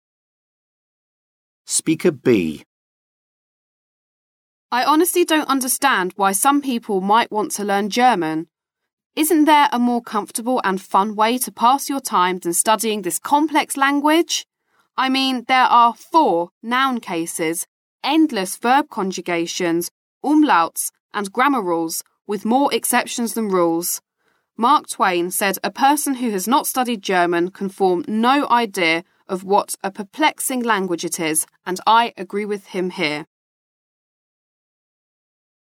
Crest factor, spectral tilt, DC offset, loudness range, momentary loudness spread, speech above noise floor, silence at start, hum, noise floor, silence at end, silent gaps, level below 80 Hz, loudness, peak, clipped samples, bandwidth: 16 dB; -3 dB/octave; under 0.1%; 5 LU; 9 LU; 49 dB; 1.7 s; none; -67 dBFS; 2.4 s; 2.66-4.69 s, 8.93-8.97 s, 9.06-9.10 s, 16.51-16.61 s, 17.68-17.99 s, 19.91-20.21 s, 21.00-21.09 s; -70 dBFS; -18 LUFS; -4 dBFS; under 0.1%; 17.5 kHz